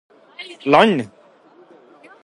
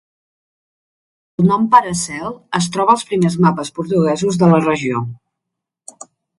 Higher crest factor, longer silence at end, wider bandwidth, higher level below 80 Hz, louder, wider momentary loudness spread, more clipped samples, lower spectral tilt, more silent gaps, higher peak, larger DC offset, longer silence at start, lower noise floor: about the same, 20 dB vs 18 dB; about the same, 1.2 s vs 1.25 s; about the same, 11 kHz vs 11.5 kHz; second, -64 dBFS vs -54 dBFS; about the same, -16 LUFS vs -15 LUFS; first, 22 LU vs 13 LU; neither; about the same, -6 dB/octave vs -6 dB/octave; neither; about the same, 0 dBFS vs 0 dBFS; neither; second, 0.4 s vs 1.4 s; second, -50 dBFS vs -81 dBFS